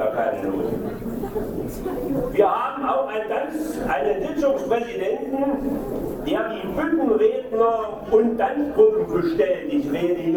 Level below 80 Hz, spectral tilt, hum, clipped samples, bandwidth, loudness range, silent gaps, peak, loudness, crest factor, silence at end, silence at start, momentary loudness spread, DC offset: -44 dBFS; -7 dB/octave; none; under 0.1%; 20 kHz; 4 LU; none; -4 dBFS; -23 LUFS; 18 dB; 0 s; 0 s; 9 LU; under 0.1%